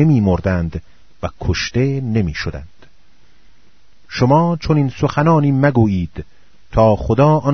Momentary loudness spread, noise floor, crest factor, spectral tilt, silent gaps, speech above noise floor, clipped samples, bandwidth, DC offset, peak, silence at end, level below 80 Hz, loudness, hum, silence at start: 15 LU; -54 dBFS; 16 dB; -7.5 dB/octave; none; 39 dB; under 0.1%; 6.4 kHz; 1%; 0 dBFS; 0 s; -34 dBFS; -16 LUFS; none; 0 s